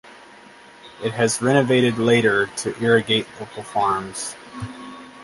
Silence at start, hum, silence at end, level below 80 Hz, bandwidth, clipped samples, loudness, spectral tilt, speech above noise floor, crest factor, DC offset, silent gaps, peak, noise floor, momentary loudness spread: 0.05 s; none; 0 s; -56 dBFS; 11.5 kHz; under 0.1%; -20 LUFS; -4.5 dB/octave; 26 dB; 20 dB; under 0.1%; none; -2 dBFS; -45 dBFS; 17 LU